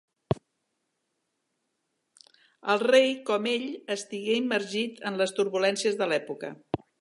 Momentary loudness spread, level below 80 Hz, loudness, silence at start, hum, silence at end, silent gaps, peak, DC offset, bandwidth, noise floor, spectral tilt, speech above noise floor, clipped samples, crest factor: 14 LU; -62 dBFS; -27 LUFS; 0.3 s; none; 0.25 s; none; -8 dBFS; under 0.1%; 11.5 kHz; -79 dBFS; -4 dB/octave; 53 dB; under 0.1%; 20 dB